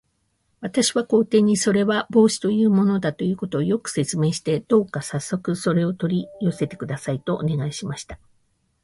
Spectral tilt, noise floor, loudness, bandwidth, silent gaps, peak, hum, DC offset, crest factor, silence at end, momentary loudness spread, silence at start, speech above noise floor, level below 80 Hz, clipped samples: -5.5 dB/octave; -69 dBFS; -22 LUFS; 11.5 kHz; none; -6 dBFS; none; under 0.1%; 16 dB; 0.7 s; 10 LU; 0.6 s; 48 dB; -56 dBFS; under 0.1%